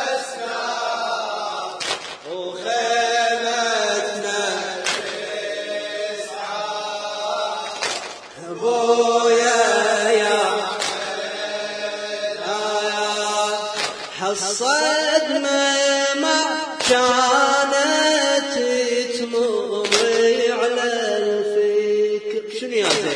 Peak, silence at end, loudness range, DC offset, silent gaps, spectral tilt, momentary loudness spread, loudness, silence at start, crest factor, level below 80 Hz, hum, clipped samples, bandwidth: 0 dBFS; 0 s; 7 LU; under 0.1%; none; -1 dB/octave; 10 LU; -20 LUFS; 0 s; 20 dB; -68 dBFS; none; under 0.1%; 10.5 kHz